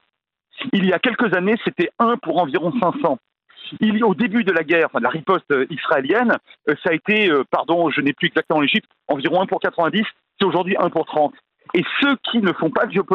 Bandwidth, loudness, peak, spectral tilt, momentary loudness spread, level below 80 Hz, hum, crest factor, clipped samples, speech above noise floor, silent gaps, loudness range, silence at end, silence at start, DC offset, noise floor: 5.8 kHz; -19 LUFS; -2 dBFS; -8 dB/octave; 5 LU; -66 dBFS; none; 18 dB; under 0.1%; 54 dB; none; 1 LU; 0 s; 0.55 s; under 0.1%; -72 dBFS